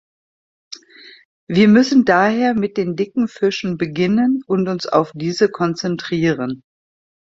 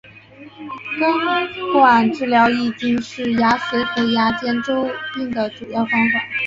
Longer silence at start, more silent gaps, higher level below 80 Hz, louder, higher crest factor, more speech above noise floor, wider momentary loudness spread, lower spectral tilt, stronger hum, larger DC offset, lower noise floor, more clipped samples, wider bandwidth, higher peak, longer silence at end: first, 0.7 s vs 0.05 s; first, 1.25-1.47 s vs none; about the same, -58 dBFS vs -56 dBFS; about the same, -17 LUFS vs -18 LUFS; about the same, 16 dB vs 16 dB; first, 28 dB vs 24 dB; about the same, 12 LU vs 10 LU; about the same, -6.5 dB/octave vs -5.5 dB/octave; neither; neither; about the same, -44 dBFS vs -42 dBFS; neither; about the same, 7.8 kHz vs 7.6 kHz; about the same, -2 dBFS vs -2 dBFS; first, 0.65 s vs 0 s